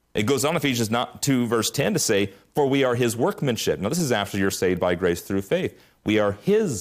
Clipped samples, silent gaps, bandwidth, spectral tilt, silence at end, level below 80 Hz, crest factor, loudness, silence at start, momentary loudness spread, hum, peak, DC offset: under 0.1%; none; 15.5 kHz; -4.5 dB/octave; 0 s; -58 dBFS; 12 dB; -23 LUFS; 0.15 s; 4 LU; none; -10 dBFS; under 0.1%